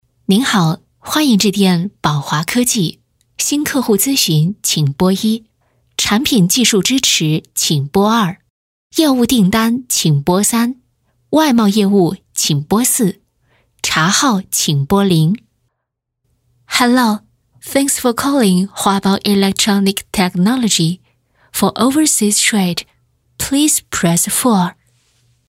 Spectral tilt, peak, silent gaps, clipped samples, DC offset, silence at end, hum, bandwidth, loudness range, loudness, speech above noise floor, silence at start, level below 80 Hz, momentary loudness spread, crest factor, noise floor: -4 dB/octave; 0 dBFS; 8.50-8.90 s; under 0.1%; under 0.1%; 0.8 s; none; 16.5 kHz; 2 LU; -14 LUFS; 62 dB; 0.3 s; -48 dBFS; 7 LU; 14 dB; -75 dBFS